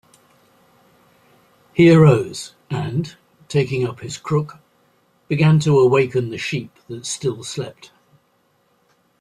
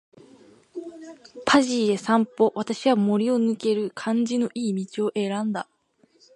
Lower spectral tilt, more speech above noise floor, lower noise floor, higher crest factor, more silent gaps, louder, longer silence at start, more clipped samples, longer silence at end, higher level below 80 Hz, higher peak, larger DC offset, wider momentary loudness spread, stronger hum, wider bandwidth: first, -6.5 dB/octave vs -5 dB/octave; first, 45 dB vs 39 dB; about the same, -62 dBFS vs -62 dBFS; about the same, 18 dB vs 20 dB; neither; first, -18 LUFS vs -23 LUFS; first, 1.75 s vs 0.75 s; neither; first, 1.5 s vs 0.75 s; first, -56 dBFS vs -70 dBFS; about the same, -2 dBFS vs -4 dBFS; neither; about the same, 18 LU vs 19 LU; neither; about the same, 11.5 kHz vs 11 kHz